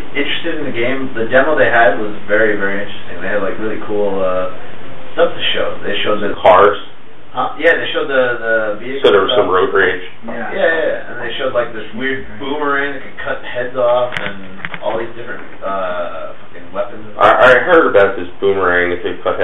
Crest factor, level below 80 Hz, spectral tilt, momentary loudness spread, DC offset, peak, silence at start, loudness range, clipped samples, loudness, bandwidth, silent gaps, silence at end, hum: 16 dB; -46 dBFS; -6 dB/octave; 16 LU; 8%; 0 dBFS; 0 s; 6 LU; under 0.1%; -15 LUFS; 7 kHz; none; 0 s; none